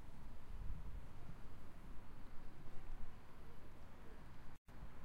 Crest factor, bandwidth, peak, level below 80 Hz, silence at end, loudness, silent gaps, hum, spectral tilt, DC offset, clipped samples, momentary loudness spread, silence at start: 12 dB; 5.2 kHz; -32 dBFS; -54 dBFS; 0 s; -59 LUFS; 4.58-4.65 s; none; -6.5 dB/octave; under 0.1%; under 0.1%; 7 LU; 0 s